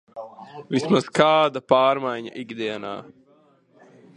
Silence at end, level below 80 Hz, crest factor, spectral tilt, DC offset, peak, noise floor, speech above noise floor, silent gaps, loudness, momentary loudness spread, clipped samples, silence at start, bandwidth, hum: 1.15 s; -66 dBFS; 22 dB; -5.5 dB/octave; under 0.1%; 0 dBFS; -58 dBFS; 36 dB; none; -21 LUFS; 21 LU; under 0.1%; 0.15 s; 10.5 kHz; none